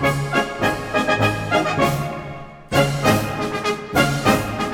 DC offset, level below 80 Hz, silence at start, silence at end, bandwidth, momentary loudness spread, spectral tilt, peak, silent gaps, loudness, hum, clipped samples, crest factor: under 0.1%; -40 dBFS; 0 s; 0 s; 18 kHz; 8 LU; -5 dB/octave; -2 dBFS; none; -20 LUFS; none; under 0.1%; 18 dB